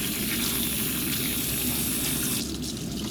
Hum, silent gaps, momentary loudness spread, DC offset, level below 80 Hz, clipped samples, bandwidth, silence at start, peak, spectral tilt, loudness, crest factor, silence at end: none; none; 6 LU; under 0.1%; -44 dBFS; under 0.1%; over 20 kHz; 0 s; -14 dBFS; -2.5 dB/octave; -26 LUFS; 14 dB; 0 s